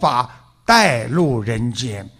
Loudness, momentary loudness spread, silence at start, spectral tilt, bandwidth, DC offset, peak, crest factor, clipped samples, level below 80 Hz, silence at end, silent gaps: -17 LUFS; 13 LU; 0 s; -4.5 dB/octave; 15.5 kHz; under 0.1%; 0 dBFS; 16 dB; under 0.1%; -44 dBFS; 0.1 s; none